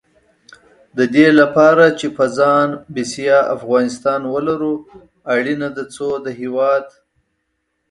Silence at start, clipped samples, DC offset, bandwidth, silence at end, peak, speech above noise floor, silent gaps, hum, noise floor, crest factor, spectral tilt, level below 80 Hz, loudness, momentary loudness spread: 0.95 s; under 0.1%; under 0.1%; 11.5 kHz; 1.05 s; 0 dBFS; 55 dB; none; none; -70 dBFS; 16 dB; -5.5 dB/octave; -60 dBFS; -15 LUFS; 14 LU